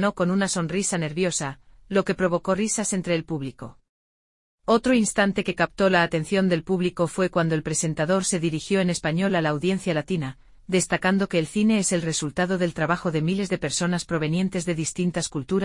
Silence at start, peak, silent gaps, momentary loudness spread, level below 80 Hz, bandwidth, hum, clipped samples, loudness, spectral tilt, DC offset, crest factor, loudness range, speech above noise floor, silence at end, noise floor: 0 s; -6 dBFS; 3.89-4.58 s; 5 LU; -52 dBFS; 11.5 kHz; none; under 0.1%; -24 LUFS; -4.5 dB/octave; under 0.1%; 18 dB; 3 LU; over 67 dB; 0 s; under -90 dBFS